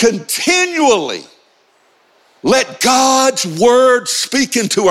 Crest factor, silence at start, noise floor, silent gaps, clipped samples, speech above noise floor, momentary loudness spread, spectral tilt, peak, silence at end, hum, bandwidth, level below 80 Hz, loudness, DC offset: 12 dB; 0 s; -54 dBFS; none; under 0.1%; 41 dB; 6 LU; -2.5 dB/octave; -2 dBFS; 0 s; none; 16.5 kHz; -54 dBFS; -13 LUFS; under 0.1%